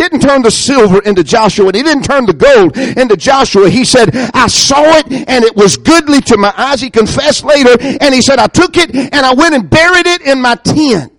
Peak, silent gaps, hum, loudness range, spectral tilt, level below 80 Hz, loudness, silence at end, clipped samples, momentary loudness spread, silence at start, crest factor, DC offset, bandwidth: 0 dBFS; none; none; 1 LU; -4 dB/octave; -34 dBFS; -7 LUFS; 0.1 s; 1%; 4 LU; 0 s; 6 dB; under 0.1%; 18 kHz